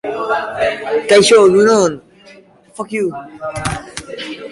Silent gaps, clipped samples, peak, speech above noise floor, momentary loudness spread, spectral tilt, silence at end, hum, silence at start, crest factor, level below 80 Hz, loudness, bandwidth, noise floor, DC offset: none; under 0.1%; 0 dBFS; 30 dB; 19 LU; -4 dB/octave; 0 s; none; 0.05 s; 14 dB; -46 dBFS; -13 LUFS; 11.5 kHz; -43 dBFS; under 0.1%